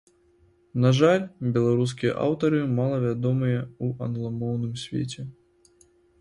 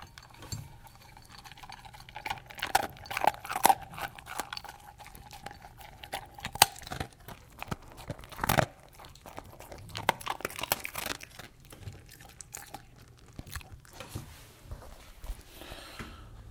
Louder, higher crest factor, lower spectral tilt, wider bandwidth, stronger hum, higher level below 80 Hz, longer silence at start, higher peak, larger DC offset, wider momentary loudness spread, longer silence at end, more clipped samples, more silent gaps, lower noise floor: first, -25 LUFS vs -33 LUFS; second, 20 dB vs 36 dB; first, -7.5 dB/octave vs -2.5 dB/octave; second, 11 kHz vs 18 kHz; neither; second, -60 dBFS vs -54 dBFS; first, 0.75 s vs 0 s; second, -6 dBFS vs 0 dBFS; neither; second, 10 LU vs 22 LU; first, 0.9 s vs 0 s; neither; neither; first, -61 dBFS vs -54 dBFS